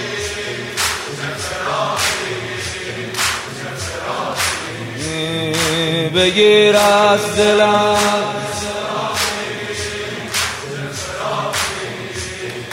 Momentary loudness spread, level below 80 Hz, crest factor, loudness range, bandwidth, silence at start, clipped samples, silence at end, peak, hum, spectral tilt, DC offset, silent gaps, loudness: 13 LU; -48 dBFS; 16 dB; 8 LU; 16 kHz; 0 s; under 0.1%; 0 s; -2 dBFS; none; -3 dB/octave; under 0.1%; none; -17 LUFS